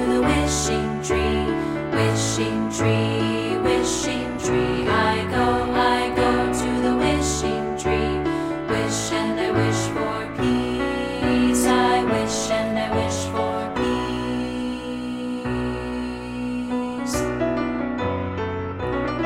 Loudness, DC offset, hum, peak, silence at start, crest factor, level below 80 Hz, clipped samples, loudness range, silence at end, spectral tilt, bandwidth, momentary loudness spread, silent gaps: -22 LUFS; under 0.1%; none; -6 dBFS; 0 s; 16 dB; -38 dBFS; under 0.1%; 5 LU; 0 s; -5 dB/octave; 16 kHz; 7 LU; none